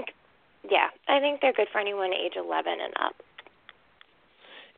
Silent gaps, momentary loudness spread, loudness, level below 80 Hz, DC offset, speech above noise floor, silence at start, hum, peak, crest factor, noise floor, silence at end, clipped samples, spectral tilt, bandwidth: none; 9 LU; -27 LUFS; -76 dBFS; under 0.1%; 35 dB; 0 s; none; -6 dBFS; 24 dB; -63 dBFS; 0.15 s; under 0.1%; -6 dB/octave; 4.4 kHz